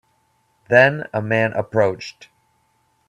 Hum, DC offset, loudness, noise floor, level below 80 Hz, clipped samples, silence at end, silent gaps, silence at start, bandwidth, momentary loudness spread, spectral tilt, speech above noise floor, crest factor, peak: none; under 0.1%; -18 LUFS; -64 dBFS; -60 dBFS; under 0.1%; 0.95 s; none; 0.7 s; 10.5 kHz; 14 LU; -6.5 dB/octave; 46 dB; 20 dB; 0 dBFS